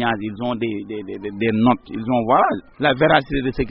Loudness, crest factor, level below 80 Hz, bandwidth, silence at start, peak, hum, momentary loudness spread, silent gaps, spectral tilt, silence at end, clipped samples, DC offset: -19 LUFS; 20 dB; -40 dBFS; 5.6 kHz; 0 s; 0 dBFS; none; 12 LU; none; -4 dB/octave; 0 s; under 0.1%; under 0.1%